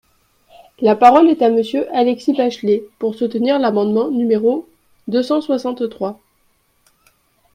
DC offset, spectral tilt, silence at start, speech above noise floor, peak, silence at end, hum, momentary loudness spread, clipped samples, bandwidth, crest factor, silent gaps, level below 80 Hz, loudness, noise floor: under 0.1%; -6.5 dB/octave; 0.8 s; 45 dB; 0 dBFS; 1.4 s; none; 12 LU; under 0.1%; 11.5 kHz; 16 dB; none; -62 dBFS; -16 LUFS; -61 dBFS